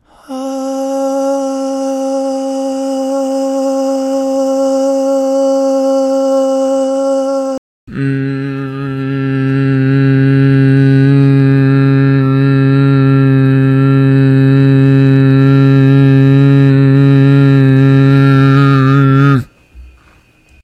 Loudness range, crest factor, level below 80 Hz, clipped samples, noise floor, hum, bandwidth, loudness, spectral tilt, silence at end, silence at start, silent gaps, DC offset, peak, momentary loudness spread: 8 LU; 10 dB; -46 dBFS; 0.3%; -47 dBFS; none; 8.6 kHz; -10 LUFS; -8.5 dB/octave; 0.75 s; 0.3 s; 7.58-7.87 s; under 0.1%; 0 dBFS; 9 LU